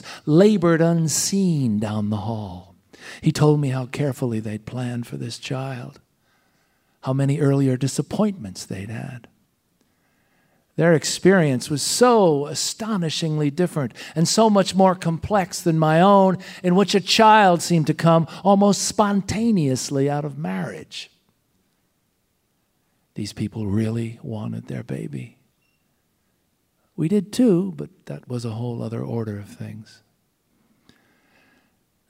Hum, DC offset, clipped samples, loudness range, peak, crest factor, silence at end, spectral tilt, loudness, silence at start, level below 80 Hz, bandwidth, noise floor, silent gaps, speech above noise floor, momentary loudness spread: none; under 0.1%; under 0.1%; 14 LU; -2 dBFS; 18 dB; 2.25 s; -5.5 dB/octave; -20 LUFS; 0.05 s; -58 dBFS; 16 kHz; -69 dBFS; none; 49 dB; 17 LU